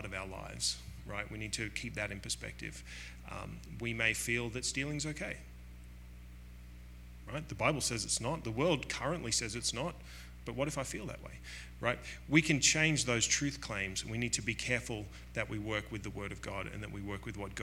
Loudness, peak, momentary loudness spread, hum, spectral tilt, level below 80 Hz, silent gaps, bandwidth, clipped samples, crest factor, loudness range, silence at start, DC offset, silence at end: -35 LUFS; -10 dBFS; 19 LU; 60 Hz at -50 dBFS; -3 dB/octave; -52 dBFS; none; 16.5 kHz; under 0.1%; 26 dB; 8 LU; 0 s; under 0.1%; 0 s